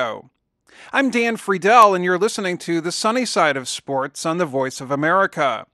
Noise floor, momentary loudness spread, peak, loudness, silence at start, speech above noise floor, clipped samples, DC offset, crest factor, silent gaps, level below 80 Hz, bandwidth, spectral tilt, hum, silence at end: -56 dBFS; 11 LU; 0 dBFS; -19 LUFS; 0 s; 38 dB; under 0.1%; under 0.1%; 18 dB; none; -68 dBFS; 12.5 kHz; -4 dB/octave; none; 0.1 s